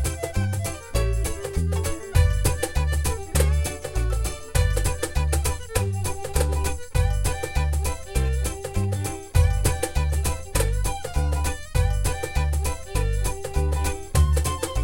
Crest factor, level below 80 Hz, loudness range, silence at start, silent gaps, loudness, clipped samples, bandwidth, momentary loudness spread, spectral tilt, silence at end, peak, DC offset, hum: 16 dB; -26 dBFS; 1 LU; 0 s; none; -25 LUFS; under 0.1%; 17 kHz; 6 LU; -5 dB/octave; 0 s; -6 dBFS; under 0.1%; none